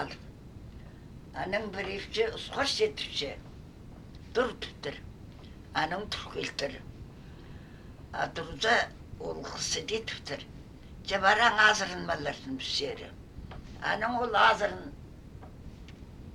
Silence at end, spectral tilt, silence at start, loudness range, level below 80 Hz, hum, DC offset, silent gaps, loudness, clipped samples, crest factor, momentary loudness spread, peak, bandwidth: 0 s; -3 dB/octave; 0 s; 8 LU; -52 dBFS; none; under 0.1%; none; -30 LUFS; under 0.1%; 24 dB; 25 LU; -8 dBFS; 16 kHz